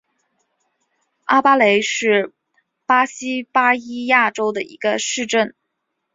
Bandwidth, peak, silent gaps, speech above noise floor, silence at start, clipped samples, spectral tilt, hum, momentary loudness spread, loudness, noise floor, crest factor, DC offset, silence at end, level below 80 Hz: 8 kHz; 0 dBFS; none; 58 dB; 1.3 s; under 0.1%; -2.5 dB/octave; none; 11 LU; -17 LUFS; -75 dBFS; 18 dB; under 0.1%; 0.65 s; -68 dBFS